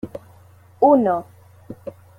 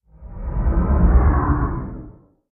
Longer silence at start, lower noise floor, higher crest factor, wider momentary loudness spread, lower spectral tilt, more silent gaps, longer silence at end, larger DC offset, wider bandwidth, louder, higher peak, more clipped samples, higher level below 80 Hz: second, 0.05 s vs 0.2 s; first, -49 dBFS vs -43 dBFS; about the same, 20 dB vs 16 dB; first, 24 LU vs 18 LU; second, -9.5 dB/octave vs -14.5 dB/octave; neither; about the same, 0.3 s vs 0.4 s; neither; first, 4.9 kHz vs 2.5 kHz; about the same, -18 LUFS vs -20 LUFS; about the same, -2 dBFS vs -4 dBFS; neither; second, -60 dBFS vs -20 dBFS